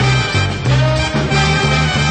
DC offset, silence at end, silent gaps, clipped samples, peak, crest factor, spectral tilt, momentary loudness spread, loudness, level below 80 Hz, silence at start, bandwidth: under 0.1%; 0 s; none; under 0.1%; -2 dBFS; 12 dB; -5 dB/octave; 3 LU; -14 LUFS; -26 dBFS; 0 s; 9 kHz